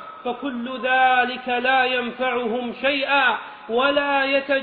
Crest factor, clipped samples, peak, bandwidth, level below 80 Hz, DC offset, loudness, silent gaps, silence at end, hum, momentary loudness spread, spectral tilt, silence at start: 16 dB; under 0.1%; -6 dBFS; 4.7 kHz; -62 dBFS; under 0.1%; -21 LUFS; none; 0 s; none; 10 LU; -6 dB/octave; 0 s